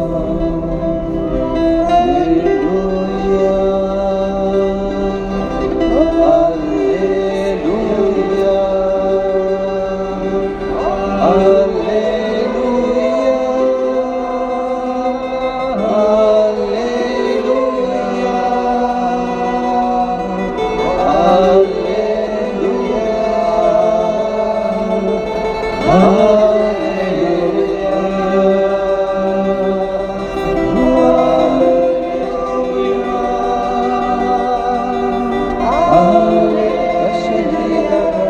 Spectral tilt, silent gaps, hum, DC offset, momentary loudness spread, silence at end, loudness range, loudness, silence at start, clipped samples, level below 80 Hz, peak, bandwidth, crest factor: -7 dB/octave; none; none; under 0.1%; 7 LU; 0 s; 2 LU; -15 LUFS; 0 s; under 0.1%; -34 dBFS; 0 dBFS; 8.8 kHz; 14 dB